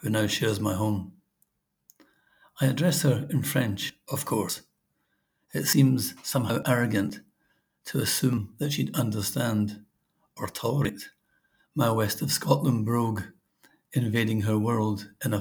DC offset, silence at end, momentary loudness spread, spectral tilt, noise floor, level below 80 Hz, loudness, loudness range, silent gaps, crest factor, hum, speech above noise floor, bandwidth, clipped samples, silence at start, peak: under 0.1%; 0 s; 12 LU; -5 dB/octave; -75 dBFS; -66 dBFS; -27 LUFS; 3 LU; none; 22 dB; none; 49 dB; over 20 kHz; under 0.1%; 0 s; -6 dBFS